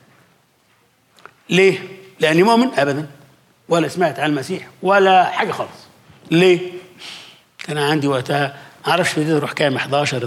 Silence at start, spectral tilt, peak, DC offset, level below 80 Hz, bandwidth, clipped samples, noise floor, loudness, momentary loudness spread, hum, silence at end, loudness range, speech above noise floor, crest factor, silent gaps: 1.5 s; -5 dB/octave; -4 dBFS; under 0.1%; -68 dBFS; 15 kHz; under 0.1%; -58 dBFS; -17 LUFS; 18 LU; none; 0 s; 3 LU; 42 dB; 16 dB; none